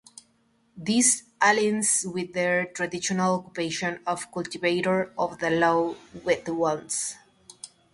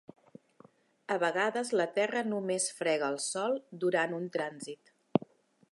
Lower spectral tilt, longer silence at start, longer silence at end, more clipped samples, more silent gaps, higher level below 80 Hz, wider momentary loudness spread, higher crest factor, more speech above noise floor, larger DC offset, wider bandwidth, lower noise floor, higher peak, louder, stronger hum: about the same, -3 dB/octave vs -3.5 dB/octave; second, 0.75 s vs 1.1 s; second, 0.25 s vs 0.55 s; neither; neither; first, -66 dBFS vs -80 dBFS; first, 12 LU vs 8 LU; second, 20 dB vs 26 dB; first, 40 dB vs 30 dB; neither; about the same, 11.5 kHz vs 11.5 kHz; first, -66 dBFS vs -62 dBFS; about the same, -6 dBFS vs -8 dBFS; first, -25 LUFS vs -32 LUFS; neither